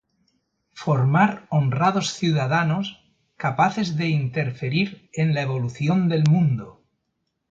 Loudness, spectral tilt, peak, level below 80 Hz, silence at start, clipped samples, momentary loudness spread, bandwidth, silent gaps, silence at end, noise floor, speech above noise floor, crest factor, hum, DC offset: -22 LUFS; -6.5 dB/octave; -4 dBFS; -60 dBFS; 0.75 s; under 0.1%; 8 LU; 7.8 kHz; none; 0.8 s; -76 dBFS; 55 dB; 18 dB; none; under 0.1%